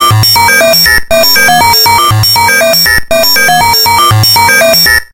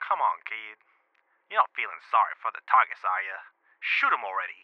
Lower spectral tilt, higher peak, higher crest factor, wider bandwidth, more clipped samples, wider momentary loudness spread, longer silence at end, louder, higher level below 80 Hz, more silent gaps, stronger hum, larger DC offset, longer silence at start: about the same, -2 dB/octave vs -1 dB/octave; first, 0 dBFS vs -6 dBFS; second, 6 dB vs 22 dB; first, over 20 kHz vs 6.6 kHz; first, 0.9% vs under 0.1%; second, 2 LU vs 13 LU; about the same, 0.05 s vs 0.1 s; first, -4 LUFS vs -27 LUFS; first, -28 dBFS vs under -90 dBFS; neither; neither; neither; about the same, 0 s vs 0 s